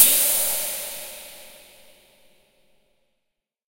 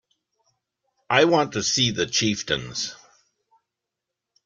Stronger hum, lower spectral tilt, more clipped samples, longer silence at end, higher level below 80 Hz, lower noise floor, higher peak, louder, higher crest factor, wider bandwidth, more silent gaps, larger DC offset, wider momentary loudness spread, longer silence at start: neither; second, 1.5 dB/octave vs -3 dB/octave; neither; first, 2.3 s vs 1.5 s; about the same, -62 dBFS vs -58 dBFS; second, -80 dBFS vs -85 dBFS; first, 0 dBFS vs -4 dBFS; about the same, -20 LUFS vs -22 LUFS; about the same, 26 dB vs 22 dB; first, 16.5 kHz vs 10.5 kHz; neither; neither; first, 24 LU vs 11 LU; second, 0 s vs 1.1 s